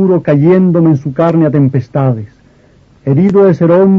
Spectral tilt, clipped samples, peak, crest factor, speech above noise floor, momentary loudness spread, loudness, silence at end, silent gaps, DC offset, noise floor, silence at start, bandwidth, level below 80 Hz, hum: -11 dB/octave; under 0.1%; 0 dBFS; 10 dB; 36 dB; 7 LU; -10 LUFS; 0 s; none; under 0.1%; -45 dBFS; 0 s; 6.4 kHz; -46 dBFS; none